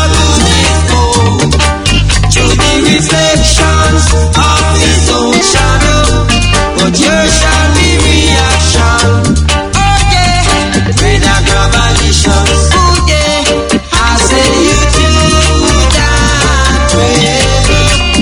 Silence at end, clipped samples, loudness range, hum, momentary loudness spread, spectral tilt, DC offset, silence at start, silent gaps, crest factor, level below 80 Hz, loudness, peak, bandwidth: 0 s; 1%; 1 LU; none; 2 LU; -4 dB/octave; under 0.1%; 0 s; none; 8 dB; -14 dBFS; -7 LUFS; 0 dBFS; 12 kHz